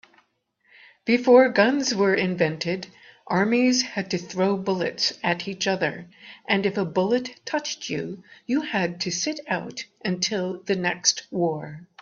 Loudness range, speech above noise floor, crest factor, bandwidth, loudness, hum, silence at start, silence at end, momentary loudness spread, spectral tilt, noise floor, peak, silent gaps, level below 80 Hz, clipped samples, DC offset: 6 LU; 44 dB; 22 dB; 7.4 kHz; -24 LUFS; none; 1.05 s; 0.2 s; 12 LU; -4 dB/octave; -68 dBFS; -4 dBFS; none; -66 dBFS; under 0.1%; under 0.1%